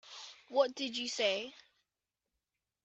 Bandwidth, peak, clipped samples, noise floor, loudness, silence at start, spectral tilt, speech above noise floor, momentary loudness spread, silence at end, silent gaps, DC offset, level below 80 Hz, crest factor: 8.4 kHz; -16 dBFS; under 0.1%; under -90 dBFS; -34 LUFS; 0.05 s; -1.5 dB/octave; over 56 dB; 16 LU; 1.25 s; none; under 0.1%; -86 dBFS; 22 dB